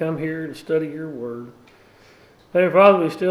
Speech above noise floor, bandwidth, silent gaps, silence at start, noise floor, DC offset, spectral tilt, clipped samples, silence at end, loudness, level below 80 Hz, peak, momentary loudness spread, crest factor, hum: 32 dB; 12.5 kHz; none; 0 s; -51 dBFS; under 0.1%; -7.5 dB/octave; under 0.1%; 0 s; -19 LUFS; -64 dBFS; -2 dBFS; 18 LU; 18 dB; none